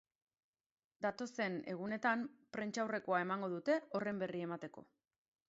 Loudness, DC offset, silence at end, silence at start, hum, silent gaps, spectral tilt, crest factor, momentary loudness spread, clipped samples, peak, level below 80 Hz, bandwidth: -40 LUFS; under 0.1%; 0.65 s; 1 s; none; none; -4.5 dB/octave; 20 dB; 8 LU; under 0.1%; -22 dBFS; -84 dBFS; 7.6 kHz